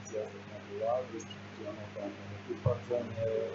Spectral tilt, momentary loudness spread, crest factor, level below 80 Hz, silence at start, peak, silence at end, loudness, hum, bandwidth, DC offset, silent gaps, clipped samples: -6 dB/octave; 10 LU; 20 dB; -66 dBFS; 0 s; -16 dBFS; 0 s; -38 LUFS; 50 Hz at -50 dBFS; 7.6 kHz; under 0.1%; none; under 0.1%